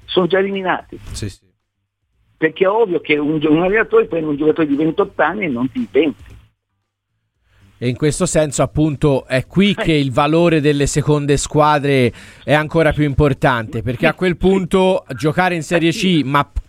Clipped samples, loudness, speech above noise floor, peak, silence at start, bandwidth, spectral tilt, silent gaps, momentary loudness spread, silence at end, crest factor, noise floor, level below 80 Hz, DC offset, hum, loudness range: under 0.1%; -16 LUFS; 57 dB; 0 dBFS; 0.1 s; 15 kHz; -5.5 dB/octave; none; 6 LU; 0.05 s; 16 dB; -72 dBFS; -36 dBFS; under 0.1%; none; 5 LU